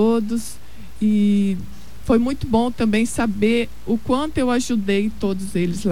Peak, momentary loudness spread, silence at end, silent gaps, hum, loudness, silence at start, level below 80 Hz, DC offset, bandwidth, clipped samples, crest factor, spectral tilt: -6 dBFS; 8 LU; 0 s; none; none; -20 LUFS; 0 s; -40 dBFS; 3%; 15 kHz; under 0.1%; 14 dB; -6 dB/octave